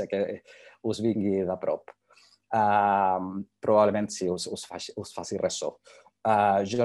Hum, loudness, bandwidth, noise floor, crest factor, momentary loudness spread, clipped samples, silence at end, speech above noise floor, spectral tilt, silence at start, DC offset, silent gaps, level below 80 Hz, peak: none; -27 LUFS; 12 kHz; -61 dBFS; 20 dB; 14 LU; under 0.1%; 0 s; 34 dB; -5 dB/octave; 0 s; under 0.1%; none; -72 dBFS; -8 dBFS